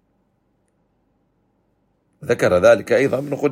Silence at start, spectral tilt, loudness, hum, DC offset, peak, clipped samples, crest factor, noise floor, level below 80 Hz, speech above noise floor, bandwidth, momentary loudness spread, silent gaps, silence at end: 2.2 s; -5.5 dB/octave; -17 LUFS; none; under 0.1%; -2 dBFS; under 0.1%; 20 dB; -66 dBFS; -58 dBFS; 50 dB; 15.5 kHz; 10 LU; none; 0 s